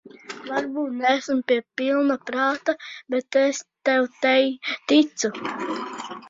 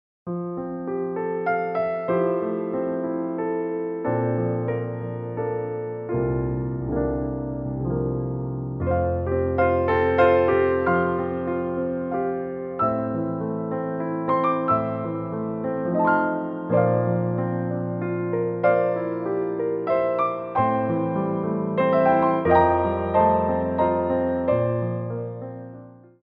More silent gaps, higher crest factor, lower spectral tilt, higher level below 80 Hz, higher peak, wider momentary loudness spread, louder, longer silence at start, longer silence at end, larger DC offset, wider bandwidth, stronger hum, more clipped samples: neither; about the same, 18 dB vs 18 dB; second, -2.5 dB/octave vs -11 dB/octave; second, -70 dBFS vs -46 dBFS; about the same, -4 dBFS vs -6 dBFS; about the same, 10 LU vs 10 LU; about the same, -23 LUFS vs -24 LUFS; second, 0.05 s vs 0.25 s; second, 0 s vs 0.3 s; neither; first, 7.8 kHz vs 5.2 kHz; neither; neither